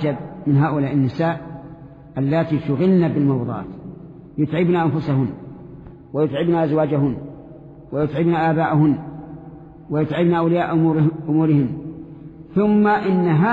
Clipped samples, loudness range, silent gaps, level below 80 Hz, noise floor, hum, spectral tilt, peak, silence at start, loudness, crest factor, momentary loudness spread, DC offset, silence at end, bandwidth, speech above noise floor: under 0.1%; 3 LU; none; -50 dBFS; -40 dBFS; none; -10.5 dB/octave; -6 dBFS; 0 s; -19 LUFS; 12 dB; 20 LU; under 0.1%; 0 s; 5 kHz; 22 dB